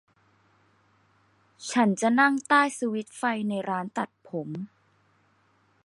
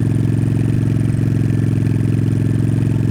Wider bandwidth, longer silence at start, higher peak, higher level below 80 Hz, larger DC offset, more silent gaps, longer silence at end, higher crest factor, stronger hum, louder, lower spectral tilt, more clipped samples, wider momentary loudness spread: about the same, 11.5 kHz vs 11 kHz; first, 1.6 s vs 0 s; about the same, -8 dBFS vs -6 dBFS; second, -78 dBFS vs -34 dBFS; neither; neither; first, 1.2 s vs 0 s; first, 22 dB vs 10 dB; neither; second, -26 LUFS vs -17 LUFS; second, -4.5 dB/octave vs -9 dB/octave; neither; first, 16 LU vs 0 LU